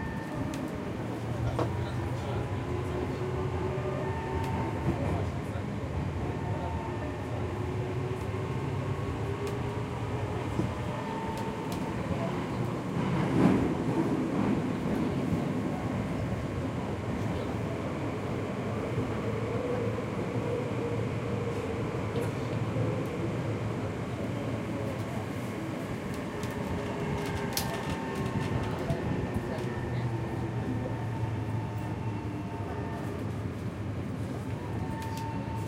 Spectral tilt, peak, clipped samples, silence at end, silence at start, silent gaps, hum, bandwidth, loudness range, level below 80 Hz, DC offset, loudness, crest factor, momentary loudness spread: -7 dB/octave; -10 dBFS; under 0.1%; 0 s; 0 s; none; none; 16 kHz; 5 LU; -48 dBFS; under 0.1%; -33 LUFS; 22 dB; 5 LU